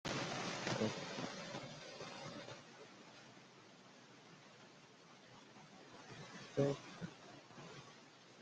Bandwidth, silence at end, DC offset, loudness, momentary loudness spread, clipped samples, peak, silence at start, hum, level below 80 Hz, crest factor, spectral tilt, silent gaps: 9 kHz; 0 s; under 0.1%; -45 LUFS; 21 LU; under 0.1%; -24 dBFS; 0.05 s; none; -76 dBFS; 24 dB; -4.5 dB/octave; none